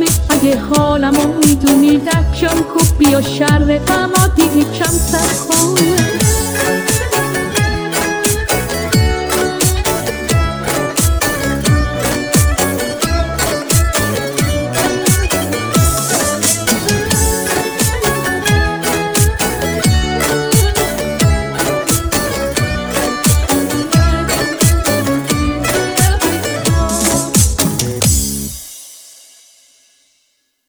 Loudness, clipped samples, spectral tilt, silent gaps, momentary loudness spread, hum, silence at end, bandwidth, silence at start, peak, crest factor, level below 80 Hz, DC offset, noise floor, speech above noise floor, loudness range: -13 LUFS; under 0.1%; -4 dB/octave; none; 5 LU; none; 1.6 s; over 20 kHz; 0 s; 0 dBFS; 14 dB; -22 dBFS; under 0.1%; -62 dBFS; 50 dB; 3 LU